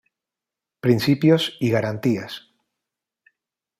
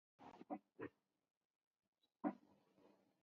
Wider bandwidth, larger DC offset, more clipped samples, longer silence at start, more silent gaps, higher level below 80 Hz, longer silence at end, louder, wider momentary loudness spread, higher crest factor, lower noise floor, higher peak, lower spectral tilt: first, 15.5 kHz vs 6.8 kHz; neither; neither; first, 0.85 s vs 0.2 s; second, none vs 1.37-1.50 s, 1.56-1.61 s, 1.67-1.71 s, 1.79-1.93 s; first, -62 dBFS vs under -90 dBFS; first, 1.4 s vs 0.35 s; first, -20 LUFS vs -52 LUFS; second, 12 LU vs 15 LU; second, 20 dB vs 26 dB; first, -88 dBFS vs -75 dBFS; first, -4 dBFS vs -30 dBFS; about the same, -6.5 dB/octave vs -6.5 dB/octave